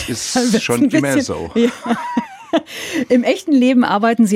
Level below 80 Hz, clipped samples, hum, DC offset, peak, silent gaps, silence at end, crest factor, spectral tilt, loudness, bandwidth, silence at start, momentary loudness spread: -52 dBFS; under 0.1%; none; under 0.1%; -2 dBFS; none; 0 s; 12 dB; -4.5 dB/octave; -16 LUFS; 15.5 kHz; 0 s; 8 LU